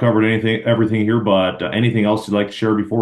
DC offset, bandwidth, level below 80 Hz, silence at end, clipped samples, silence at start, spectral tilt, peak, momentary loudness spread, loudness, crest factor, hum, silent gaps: under 0.1%; 12 kHz; -58 dBFS; 0 s; under 0.1%; 0 s; -7.5 dB/octave; -2 dBFS; 3 LU; -17 LUFS; 14 dB; none; none